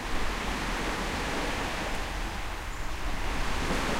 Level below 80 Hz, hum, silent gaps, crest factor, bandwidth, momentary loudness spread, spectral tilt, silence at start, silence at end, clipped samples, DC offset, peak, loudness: -36 dBFS; none; none; 14 dB; 16 kHz; 5 LU; -4 dB/octave; 0 s; 0 s; under 0.1%; under 0.1%; -16 dBFS; -32 LUFS